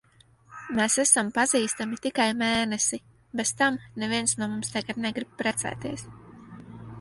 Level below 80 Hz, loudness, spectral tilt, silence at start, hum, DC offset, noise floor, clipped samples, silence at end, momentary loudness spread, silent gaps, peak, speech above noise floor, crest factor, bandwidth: -60 dBFS; -26 LUFS; -2 dB/octave; 0.5 s; none; under 0.1%; -58 dBFS; under 0.1%; 0 s; 19 LU; none; -4 dBFS; 32 dB; 24 dB; 11.5 kHz